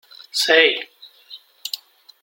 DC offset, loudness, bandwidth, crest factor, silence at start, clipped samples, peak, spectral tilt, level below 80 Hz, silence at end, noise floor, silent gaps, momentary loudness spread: under 0.1%; -18 LUFS; 16.5 kHz; 20 dB; 0.35 s; under 0.1%; -2 dBFS; 0.5 dB/octave; -76 dBFS; 0.45 s; -45 dBFS; none; 22 LU